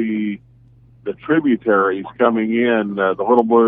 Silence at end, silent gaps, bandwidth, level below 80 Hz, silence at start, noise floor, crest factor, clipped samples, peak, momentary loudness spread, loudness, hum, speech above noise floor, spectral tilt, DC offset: 0 s; none; 3.8 kHz; -58 dBFS; 0 s; -48 dBFS; 18 dB; under 0.1%; 0 dBFS; 13 LU; -17 LUFS; none; 33 dB; -9.5 dB/octave; under 0.1%